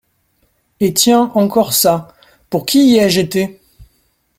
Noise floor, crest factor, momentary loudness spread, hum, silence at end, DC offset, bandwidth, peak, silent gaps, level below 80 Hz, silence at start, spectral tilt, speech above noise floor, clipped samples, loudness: -61 dBFS; 14 dB; 11 LU; none; 0.55 s; under 0.1%; 16.5 kHz; 0 dBFS; none; -50 dBFS; 0.8 s; -4 dB/octave; 48 dB; under 0.1%; -13 LUFS